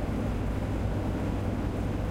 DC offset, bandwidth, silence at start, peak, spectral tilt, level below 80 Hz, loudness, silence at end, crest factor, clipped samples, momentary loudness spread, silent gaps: under 0.1%; 16 kHz; 0 s; -18 dBFS; -8 dB/octave; -34 dBFS; -31 LUFS; 0 s; 10 dB; under 0.1%; 1 LU; none